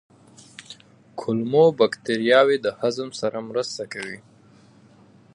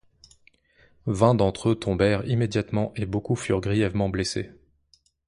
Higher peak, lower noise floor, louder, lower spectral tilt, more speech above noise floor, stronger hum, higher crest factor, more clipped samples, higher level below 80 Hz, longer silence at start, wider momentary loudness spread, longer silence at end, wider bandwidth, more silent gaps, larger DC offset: about the same, -4 dBFS vs -4 dBFS; second, -52 dBFS vs -64 dBFS; first, -22 LUFS vs -25 LUFS; second, -5 dB/octave vs -6.5 dB/octave; second, 31 dB vs 41 dB; neither; about the same, 20 dB vs 22 dB; neither; second, -70 dBFS vs -46 dBFS; second, 0.6 s vs 1.05 s; first, 24 LU vs 9 LU; first, 1.15 s vs 0.8 s; about the same, 11 kHz vs 11 kHz; neither; neither